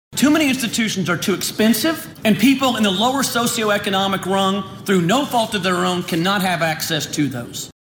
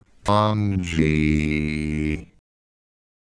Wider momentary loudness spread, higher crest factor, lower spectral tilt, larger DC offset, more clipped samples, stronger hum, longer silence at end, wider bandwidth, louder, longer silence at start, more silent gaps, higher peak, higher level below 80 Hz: about the same, 6 LU vs 6 LU; about the same, 14 dB vs 18 dB; second, -4 dB/octave vs -7 dB/octave; neither; neither; neither; second, 0.1 s vs 1.05 s; first, 17.5 kHz vs 10.5 kHz; first, -18 LUFS vs -22 LUFS; second, 0.1 s vs 0.25 s; neither; about the same, -4 dBFS vs -4 dBFS; second, -54 dBFS vs -36 dBFS